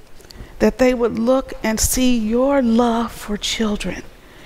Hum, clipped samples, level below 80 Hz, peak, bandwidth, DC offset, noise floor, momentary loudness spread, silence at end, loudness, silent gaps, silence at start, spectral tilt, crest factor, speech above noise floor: none; under 0.1%; -34 dBFS; -2 dBFS; 16 kHz; under 0.1%; -37 dBFS; 9 LU; 0 s; -18 LUFS; none; 0.1 s; -4 dB/octave; 16 dB; 20 dB